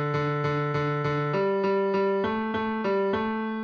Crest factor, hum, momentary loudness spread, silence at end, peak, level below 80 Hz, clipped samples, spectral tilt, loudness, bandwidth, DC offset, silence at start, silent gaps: 10 dB; none; 3 LU; 0 s; -16 dBFS; -58 dBFS; under 0.1%; -8 dB/octave; -26 LUFS; 6.8 kHz; under 0.1%; 0 s; none